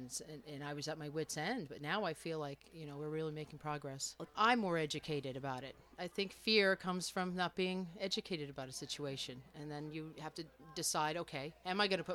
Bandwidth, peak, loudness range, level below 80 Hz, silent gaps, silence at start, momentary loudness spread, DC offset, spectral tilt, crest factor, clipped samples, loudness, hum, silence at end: 18.5 kHz; -18 dBFS; 6 LU; -72 dBFS; none; 0 s; 15 LU; under 0.1%; -3.5 dB/octave; 24 dB; under 0.1%; -40 LUFS; none; 0 s